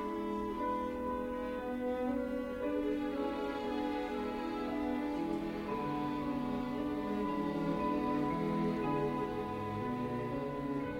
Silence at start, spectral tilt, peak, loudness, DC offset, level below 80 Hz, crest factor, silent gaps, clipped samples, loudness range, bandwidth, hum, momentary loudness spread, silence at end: 0 s; -7.5 dB/octave; -22 dBFS; -37 LUFS; under 0.1%; -56 dBFS; 14 dB; none; under 0.1%; 2 LU; 16.5 kHz; none; 4 LU; 0 s